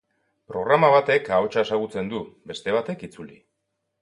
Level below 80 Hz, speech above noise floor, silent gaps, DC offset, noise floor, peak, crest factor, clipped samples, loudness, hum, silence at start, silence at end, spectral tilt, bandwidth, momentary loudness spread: -62 dBFS; 55 dB; none; under 0.1%; -78 dBFS; -4 dBFS; 20 dB; under 0.1%; -22 LUFS; none; 0.5 s; 0.75 s; -6 dB/octave; 11 kHz; 18 LU